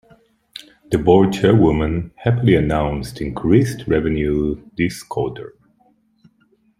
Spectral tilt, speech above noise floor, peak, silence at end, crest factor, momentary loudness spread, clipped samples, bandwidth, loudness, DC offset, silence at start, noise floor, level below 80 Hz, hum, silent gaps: -7.5 dB/octave; 42 dB; -2 dBFS; 1.3 s; 18 dB; 20 LU; under 0.1%; 15.5 kHz; -18 LUFS; under 0.1%; 0.55 s; -59 dBFS; -36 dBFS; none; none